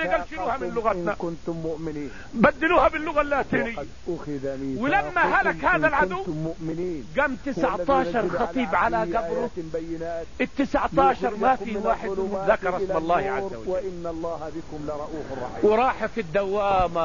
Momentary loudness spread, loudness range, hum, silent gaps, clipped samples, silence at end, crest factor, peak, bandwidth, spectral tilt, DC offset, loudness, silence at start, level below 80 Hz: 12 LU; 3 LU; none; none; under 0.1%; 0 s; 20 dB; -4 dBFS; 7.4 kHz; -6.5 dB/octave; 1%; -25 LUFS; 0 s; -44 dBFS